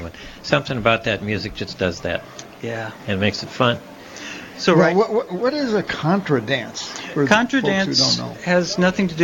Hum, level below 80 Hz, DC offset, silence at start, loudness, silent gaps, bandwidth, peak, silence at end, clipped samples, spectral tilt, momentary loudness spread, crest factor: none; -48 dBFS; under 0.1%; 0 s; -20 LUFS; none; 17 kHz; 0 dBFS; 0 s; under 0.1%; -4.5 dB/octave; 14 LU; 20 dB